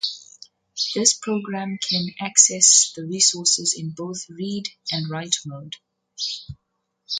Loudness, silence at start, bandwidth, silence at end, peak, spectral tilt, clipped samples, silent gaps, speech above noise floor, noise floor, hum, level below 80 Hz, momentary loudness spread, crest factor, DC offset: -19 LUFS; 0.05 s; 11 kHz; 0 s; 0 dBFS; -1.5 dB/octave; under 0.1%; none; 36 dB; -58 dBFS; none; -62 dBFS; 21 LU; 24 dB; under 0.1%